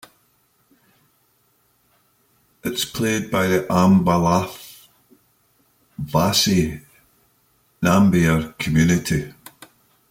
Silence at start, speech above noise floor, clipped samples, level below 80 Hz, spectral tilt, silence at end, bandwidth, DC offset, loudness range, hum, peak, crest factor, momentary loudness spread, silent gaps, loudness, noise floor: 2.65 s; 45 dB; under 0.1%; -46 dBFS; -5 dB/octave; 0.8 s; 16.5 kHz; under 0.1%; 6 LU; none; -4 dBFS; 18 dB; 18 LU; none; -19 LUFS; -63 dBFS